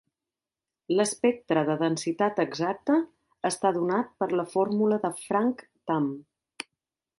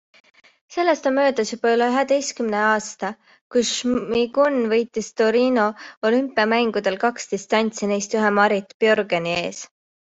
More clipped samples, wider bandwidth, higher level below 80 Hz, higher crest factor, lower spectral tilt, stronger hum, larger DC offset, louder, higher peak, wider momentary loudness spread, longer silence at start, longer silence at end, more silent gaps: neither; first, 11.5 kHz vs 8.2 kHz; second, -72 dBFS vs -62 dBFS; about the same, 18 dB vs 18 dB; first, -5 dB/octave vs -3.5 dB/octave; neither; neither; second, -27 LUFS vs -21 LUFS; second, -10 dBFS vs -4 dBFS; first, 13 LU vs 7 LU; first, 0.9 s vs 0.7 s; first, 0.55 s vs 0.4 s; second, none vs 3.41-3.50 s, 5.97-6.02 s, 8.74-8.80 s